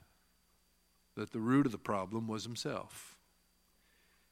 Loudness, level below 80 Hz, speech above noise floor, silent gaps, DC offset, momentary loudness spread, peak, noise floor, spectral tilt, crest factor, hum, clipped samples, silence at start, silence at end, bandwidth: -36 LUFS; -74 dBFS; 37 dB; none; under 0.1%; 20 LU; -18 dBFS; -73 dBFS; -6 dB/octave; 20 dB; none; under 0.1%; 1.15 s; 1.2 s; 15.5 kHz